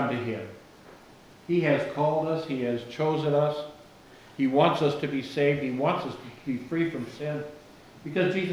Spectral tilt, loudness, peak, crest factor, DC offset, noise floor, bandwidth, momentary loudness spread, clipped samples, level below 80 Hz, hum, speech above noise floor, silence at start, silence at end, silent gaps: -7 dB/octave; -28 LUFS; -8 dBFS; 20 dB; under 0.1%; -52 dBFS; 13.5 kHz; 14 LU; under 0.1%; -66 dBFS; none; 25 dB; 0 s; 0 s; none